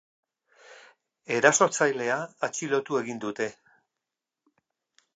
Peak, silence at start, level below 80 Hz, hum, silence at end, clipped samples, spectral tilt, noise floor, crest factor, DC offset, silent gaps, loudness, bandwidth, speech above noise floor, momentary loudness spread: -4 dBFS; 0.7 s; -82 dBFS; none; 1.65 s; under 0.1%; -3 dB/octave; -87 dBFS; 24 dB; under 0.1%; none; -26 LUFS; 9.4 kHz; 62 dB; 12 LU